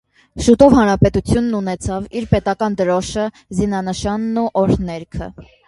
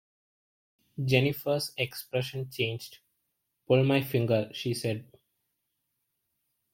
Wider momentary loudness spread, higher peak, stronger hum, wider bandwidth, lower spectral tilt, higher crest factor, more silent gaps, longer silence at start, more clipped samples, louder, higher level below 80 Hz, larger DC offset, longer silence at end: first, 14 LU vs 11 LU; first, 0 dBFS vs -8 dBFS; neither; second, 11.5 kHz vs 16.5 kHz; about the same, -6.5 dB/octave vs -6 dB/octave; second, 16 dB vs 24 dB; neither; second, 0.35 s vs 1 s; neither; first, -17 LUFS vs -29 LUFS; first, -34 dBFS vs -68 dBFS; neither; second, 0.25 s vs 1.7 s